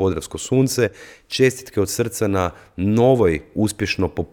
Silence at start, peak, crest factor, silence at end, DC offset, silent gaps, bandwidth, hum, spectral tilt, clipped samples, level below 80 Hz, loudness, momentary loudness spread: 0 s; -2 dBFS; 18 dB; 0.05 s; under 0.1%; none; 19 kHz; none; -5.5 dB/octave; under 0.1%; -44 dBFS; -20 LUFS; 8 LU